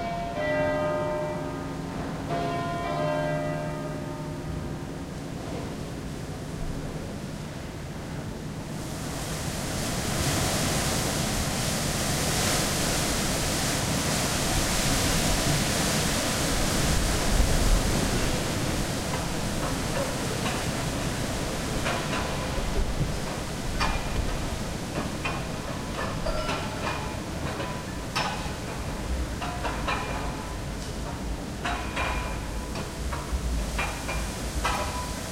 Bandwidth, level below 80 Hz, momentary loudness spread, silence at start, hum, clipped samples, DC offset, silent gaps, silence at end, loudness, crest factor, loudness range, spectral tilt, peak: 16 kHz; -34 dBFS; 10 LU; 0 s; none; under 0.1%; under 0.1%; none; 0 s; -29 LUFS; 18 dB; 9 LU; -4 dB/octave; -10 dBFS